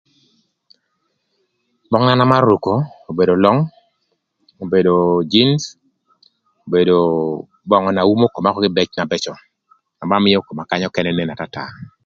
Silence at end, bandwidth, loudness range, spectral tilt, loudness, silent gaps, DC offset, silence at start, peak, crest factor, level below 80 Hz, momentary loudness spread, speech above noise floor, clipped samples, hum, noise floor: 0.2 s; 7.6 kHz; 2 LU; -6.5 dB/octave; -16 LUFS; none; under 0.1%; 1.9 s; 0 dBFS; 18 dB; -52 dBFS; 13 LU; 54 dB; under 0.1%; none; -69 dBFS